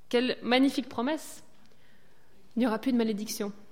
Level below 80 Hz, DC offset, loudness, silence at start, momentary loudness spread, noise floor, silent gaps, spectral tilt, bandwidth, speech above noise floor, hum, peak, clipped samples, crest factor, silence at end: -70 dBFS; 0.5%; -29 LUFS; 0.1 s; 12 LU; -63 dBFS; none; -4 dB/octave; 16.5 kHz; 34 dB; none; -12 dBFS; under 0.1%; 18 dB; 0.2 s